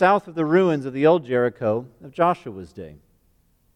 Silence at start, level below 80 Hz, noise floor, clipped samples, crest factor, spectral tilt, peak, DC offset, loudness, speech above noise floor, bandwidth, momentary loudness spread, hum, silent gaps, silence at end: 0 s; -60 dBFS; -62 dBFS; under 0.1%; 16 dB; -8 dB/octave; -6 dBFS; under 0.1%; -21 LUFS; 41 dB; 9.4 kHz; 19 LU; none; none; 0.8 s